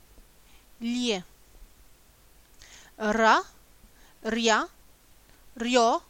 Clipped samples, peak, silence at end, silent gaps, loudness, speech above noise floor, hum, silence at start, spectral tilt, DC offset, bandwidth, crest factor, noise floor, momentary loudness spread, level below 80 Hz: under 0.1%; -8 dBFS; 0.1 s; none; -26 LUFS; 32 dB; none; 0.2 s; -2.5 dB/octave; under 0.1%; 17 kHz; 22 dB; -57 dBFS; 16 LU; -56 dBFS